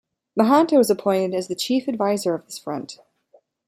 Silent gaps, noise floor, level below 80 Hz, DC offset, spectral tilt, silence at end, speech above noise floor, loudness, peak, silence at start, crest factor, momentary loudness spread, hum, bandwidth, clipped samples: none; -59 dBFS; -68 dBFS; under 0.1%; -5 dB/octave; 0.75 s; 38 dB; -21 LUFS; -4 dBFS; 0.35 s; 18 dB; 14 LU; none; 16 kHz; under 0.1%